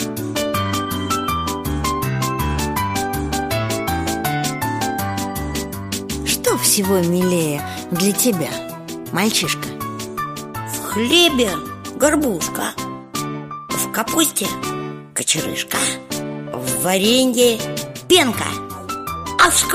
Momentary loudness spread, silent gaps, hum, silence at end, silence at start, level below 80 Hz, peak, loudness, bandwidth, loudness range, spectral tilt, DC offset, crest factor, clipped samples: 12 LU; none; none; 0 s; 0 s; -38 dBFS; 0 dBFS; -19 LUFS; 15.5 kHz; 4 LU; -3.5 dB/octave; under 0.1%; 18 dB; under 0.1%